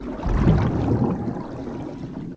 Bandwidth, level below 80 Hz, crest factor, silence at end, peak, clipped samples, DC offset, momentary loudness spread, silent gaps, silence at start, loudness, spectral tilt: 8 kHz; -30 dBFS; 16 dB; 0 s; -6 dBFS; under 0.1%; under 0.1%; 13 LU; none; 0 s; -24 LUFS; -9.5 dB/octave